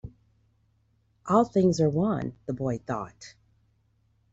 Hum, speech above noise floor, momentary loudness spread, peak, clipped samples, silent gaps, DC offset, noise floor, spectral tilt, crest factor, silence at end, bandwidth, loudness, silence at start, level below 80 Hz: none; 42 dB; 24 LU; -8 dBFS; under 0.1%; none; under 0.1%; -68 dBFS; -7.5 dB/octave; 20 dB; 1.05 s; 8 kHz; -26 LUFS; 0.05 s; -58 dBFS